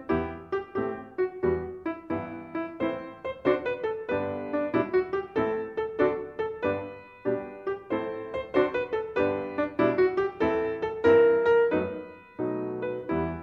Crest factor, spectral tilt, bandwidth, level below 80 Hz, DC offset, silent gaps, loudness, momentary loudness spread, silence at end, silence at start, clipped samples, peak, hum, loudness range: 18 dB; -8.5 dB/octave; 6.2 kHz; -54 dBFS; under 0.1%; none; -28 LUFS; 12 LU; 0 s; 0 s; under 0.1%; -10 dBFS; none; 6 LU